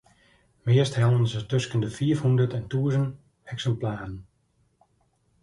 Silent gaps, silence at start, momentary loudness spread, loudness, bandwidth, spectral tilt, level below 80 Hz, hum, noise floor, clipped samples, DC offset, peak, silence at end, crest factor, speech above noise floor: none; 0.65 s; 14 LU; -25 LUFS; 11 kHz; -7 dB/octave; -56 dBFS; none; -68 dBFS; under 0.1%; under 0.1%; -10 dBFS; 1.2 s; 16 dB; 44 dB